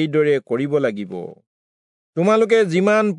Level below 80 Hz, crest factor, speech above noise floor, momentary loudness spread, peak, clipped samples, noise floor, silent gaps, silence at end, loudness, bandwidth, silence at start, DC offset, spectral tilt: -76 dBFS; 14 dB; over 72 dB; 15 LU; -4 dBFS; under 0.1%; under -90 dBFS; 1.47-2.13 s; 0 s; -18 LUFS; 10.5 kHz; 0 s; under 0.1%; -6.5 dB/octave